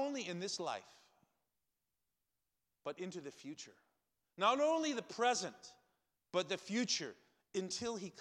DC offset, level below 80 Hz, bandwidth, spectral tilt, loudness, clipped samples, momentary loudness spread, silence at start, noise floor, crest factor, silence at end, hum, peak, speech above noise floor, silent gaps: under 0.1%; -84 dBFS; 13 kHz; -3 dB/octave; -39 LUFS; under 0.1%; 16 LU; 0 s; -90 dBFS; 22 dB; 0 s; none; -20 dBFS; 50 dB; none